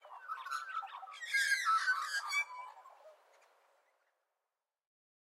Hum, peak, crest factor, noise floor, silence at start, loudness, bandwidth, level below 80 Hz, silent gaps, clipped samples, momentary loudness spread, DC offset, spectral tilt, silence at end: none; -22 dBFS; 18 dB; under -90 dBFS; 0.05 s; -35 LUFS; 16 kHz; under -90 dBFS; none; under 0.1%; 16 LU; under 0.1%; 7.5 dB/octave; 2.2 s